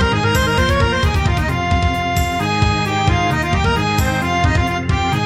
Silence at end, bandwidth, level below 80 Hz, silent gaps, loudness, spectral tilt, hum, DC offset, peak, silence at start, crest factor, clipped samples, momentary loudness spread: 0 s; 15.5 kHz; -24 dBFS; none; -16 LUFS; -5.5 dB/octave; none; 0.3%; -2 dBFS; 0 s; 14 dB; under 0.1%; 3 LU